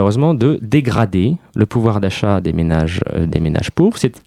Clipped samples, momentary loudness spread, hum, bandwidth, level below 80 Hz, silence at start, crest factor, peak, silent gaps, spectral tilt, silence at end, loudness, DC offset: under 0.1%; 4 LU; none; 12.5 kHz; -34 dBFS; 0 s; 14 dB; 0 dBFS; none; -7.5 dB/octave; 0.1 s; -16 LUFS; under 0.1%